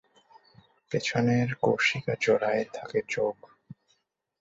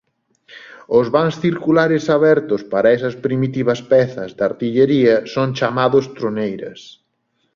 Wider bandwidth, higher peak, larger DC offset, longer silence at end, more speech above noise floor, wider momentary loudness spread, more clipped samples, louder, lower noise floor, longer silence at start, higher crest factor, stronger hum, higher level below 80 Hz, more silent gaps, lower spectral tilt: first, 8 kHz vs 7.2 kHz; second, -10 dBFS vs -2 dBFS; neither; first, 1.05 s vs 0.65 s; second, 46 dB vs 51 dB; about the same, 8 LU vs 8 LU; neither; second, -27 LUFS vs -17 LUFS; first, -73 dBFS vs -67 dBFS; first, 0.9 s vs 0.55 s; about the same, 20 dB vs 16 dB; neither; second, -66 dBFS vs -58 dBFS; neither; second, -5.5 dB/octave vs -7 dB/octave